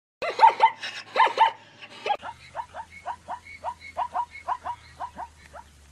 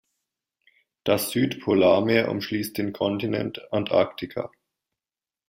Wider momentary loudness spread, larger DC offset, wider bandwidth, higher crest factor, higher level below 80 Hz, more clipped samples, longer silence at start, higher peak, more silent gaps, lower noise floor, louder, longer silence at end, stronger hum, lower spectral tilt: first, 20 LU vs 13 LU; neither; second, 11.5 kHz vs 16 kHz; about the same, 22 dB vs 20 dB; about the same, -60 dBFS vs -62 dBFS; neither; second, 0.2 s vs 1.05 s; about the same, -4 dBFS vs -6 dBFS; neither; second, -48 dBFS vs under -90 dBFS; about the same, -25 LUFS vs -24 LUFS; second, 0.3 s vs 1 s; neither; second, -2.5 dB/octave vs -5.5 dB/octave